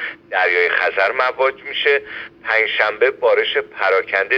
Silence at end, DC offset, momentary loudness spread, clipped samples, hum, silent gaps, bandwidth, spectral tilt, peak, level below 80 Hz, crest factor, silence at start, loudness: 0 s; under 0.1%; 5 LU; under 0.1%; none; none; 6.4 kHz; -3 dB/octave; 0 dBFS; -62 dBFS; 18 dB; 0 s; -17 LUFS